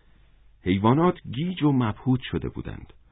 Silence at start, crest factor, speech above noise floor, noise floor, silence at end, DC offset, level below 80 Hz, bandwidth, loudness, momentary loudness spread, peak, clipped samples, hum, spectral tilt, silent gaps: 0.65 s; 18 dB; 31 dB; -55 dBFS; 0.25 s; under 0.1%; -46 dBFS; 4 kHz; -25 LUFS; 15 LU; -6 dBFS; under 0.1%; none; -12 dB/octave; none